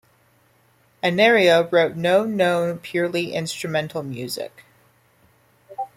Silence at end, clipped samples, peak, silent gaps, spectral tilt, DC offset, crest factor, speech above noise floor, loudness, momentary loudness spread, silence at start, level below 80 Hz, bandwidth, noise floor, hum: 0.1 s; under 0.1%; -4 dBFS; none; -5 dB/octave; under 0.1%; 18 dB; 39 dB; -20 LUFS; 14 LU; 1.05 s; -66 dBFS; 16 kHz; -59 dBFS; none